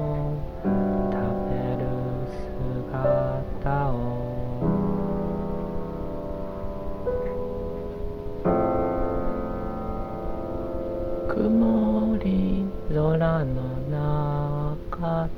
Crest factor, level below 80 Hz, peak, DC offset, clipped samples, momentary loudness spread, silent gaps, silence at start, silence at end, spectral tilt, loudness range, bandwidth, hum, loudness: 14 dB; -36 dBFS; -10 dBFS; under 0.1%; under 0.1%; 10 LU; none; 0 s; 0 s; -10.5 dB/octave; 5 LU; 6 kHz; none; -27 LUFS